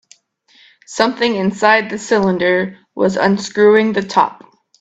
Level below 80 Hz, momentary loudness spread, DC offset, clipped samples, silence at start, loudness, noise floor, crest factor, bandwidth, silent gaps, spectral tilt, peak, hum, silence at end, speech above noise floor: -58 dBFS; 7 LU; under 0.1%; under 0.1%; 0.9 s; -15 LUFS; -53 dBFS; 16 dB; 8.4 kHz; none; -5 dB/octave; 0 dBFS; none; 0.5 s; 38 dB